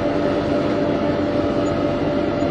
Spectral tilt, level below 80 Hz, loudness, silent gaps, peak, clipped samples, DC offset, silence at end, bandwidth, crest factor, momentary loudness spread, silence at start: -7.5 dB/octave; -40 dBFS; -20 LUFS; none; -6 dBFS; under 0.1%; under 0.1%; 0 s; 8.8 kHz; 14 dB; 1 LU; 0 s